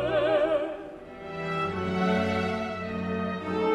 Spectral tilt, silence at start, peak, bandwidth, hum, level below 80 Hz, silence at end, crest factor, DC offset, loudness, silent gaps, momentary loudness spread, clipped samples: -7 dB/octave; 0 s; -14 dBFS; 10.5 kHz; none; -56 dBFS; 0 s; 14 dB; under 0.1%; -28 LUFS; none; 13 LU; under 0.1%